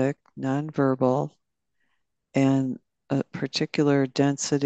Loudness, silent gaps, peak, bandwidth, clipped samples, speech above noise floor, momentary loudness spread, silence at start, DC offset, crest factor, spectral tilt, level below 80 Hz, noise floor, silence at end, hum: -25 LUFS; none; -8 dBFS; 8.8 kHz; under 0.1%; 53 dB; 9 LU; 0 s; under 0.1%; 16 dB; -6 dB/octave; -70 dBFS; -77 dBFS; 0 s; none